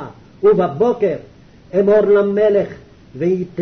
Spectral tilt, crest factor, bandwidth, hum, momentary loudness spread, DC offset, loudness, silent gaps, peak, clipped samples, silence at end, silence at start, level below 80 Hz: -9 dB/octave; 12 dB; 6.2 kHz; none; 11 LU; under 0.1%; -16 LUFS; none; -4 dBFS; under 0.1%; 0 s; 0 s; -50 dBFS